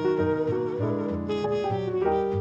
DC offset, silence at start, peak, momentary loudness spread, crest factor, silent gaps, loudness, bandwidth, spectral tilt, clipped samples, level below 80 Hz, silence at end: under 0.1%; 0 s; -12 dBFS; 3 LU; 14 dB; none; -27 LUFS; 7.6 kHz; -8.5 dB/octave; under 0.1%; -52 dBFS; 0 s